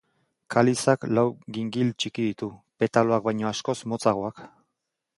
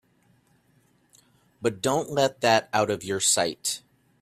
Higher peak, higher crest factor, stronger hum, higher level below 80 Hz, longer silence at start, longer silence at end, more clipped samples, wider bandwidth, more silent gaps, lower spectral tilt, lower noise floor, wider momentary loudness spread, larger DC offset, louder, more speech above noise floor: about the same, -6 dBFS vs -4 dBFS; about the same, 20 dB vs 22 dB; neither; about the same, -64 dBFS vs -66 dBFS; second, 0.5 s vs 1.6 s; first, 0.7 s vs 0.45 s; neither; second, 11.5 kHz vs 15.5 kHz; neither; first, -5.5 dB/octave vs -2.5 dB/octave; first, -82 dBFS vs -64 dBFS; about the same, 9 LU vs 9 LU; neither; about the same, -25 LUFS vs -24 LUFS; first, 57 dB vs 40 dB